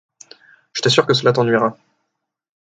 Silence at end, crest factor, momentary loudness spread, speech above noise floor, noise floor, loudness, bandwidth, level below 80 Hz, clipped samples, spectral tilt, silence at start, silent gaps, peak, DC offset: 0.9 s; 18 dB; 8 LU; 62 dB; -78 dBFS; -16 LUFS; 9.4 kHz; -62 dBFS; under 0.1%; -4.5 dB/octave; 0.75 s; none; 0 dBFS; under 0.1%